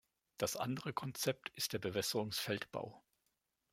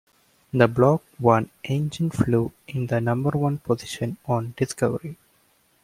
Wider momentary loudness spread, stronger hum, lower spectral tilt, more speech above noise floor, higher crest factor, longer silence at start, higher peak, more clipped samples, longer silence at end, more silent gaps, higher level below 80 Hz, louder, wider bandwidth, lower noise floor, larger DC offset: second, 6 LU vs 10 LU; neither; second, -3.5 dB/octave vs -7 dB/octave; first, 44 dB vs 40 dB; about the same, 22 dB vs 20 dB; second, 0.4 s vs 0.55 s; second, -20 dBFS vs -2 dBFS; neither; about the same, 0.75 s vs 0.7 s; neither; second, -76 dBFS vs -54 dBFS; second, -40 LUFS vs -24 LUFS; about the same, 16.5 kHz vs 15.5 kHz; first, -85 dBFS vs -63 dBFS; neither